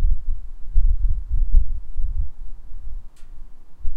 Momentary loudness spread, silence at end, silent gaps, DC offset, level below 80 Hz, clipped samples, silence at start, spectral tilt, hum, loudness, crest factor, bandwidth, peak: 22 LU; 0 s; none; under 0.1%; -20 dBFS; under 0.1%; 0 s; -9 dB/octave; none; -28 LUFS; 14 dB; 0.4 kHz; -2 dBFS